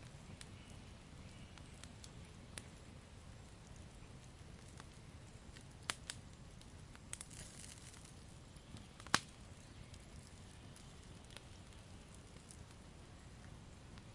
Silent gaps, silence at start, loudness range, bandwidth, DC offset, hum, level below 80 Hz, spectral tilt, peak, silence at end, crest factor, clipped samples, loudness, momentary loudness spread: none; 0 s; 10 LU; 11.5 kHz; under 0.1%; none; -62 dBFS; -3 dB/octave; -12 dBFS; 0 s; 42 dB; under 0.1%; -52 LUFS; 11 LU